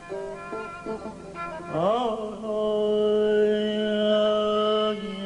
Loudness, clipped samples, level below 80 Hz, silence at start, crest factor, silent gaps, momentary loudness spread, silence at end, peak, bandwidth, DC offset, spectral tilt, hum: -25 LUFS; under 0.1%; -56 dBFS; 0 s; 14 dB; none; 13 LU; 0 s; -12 dBFS; 10.5 kHz; under 0.1%; -6 dB/octave; 50 Hz at -55 dBFS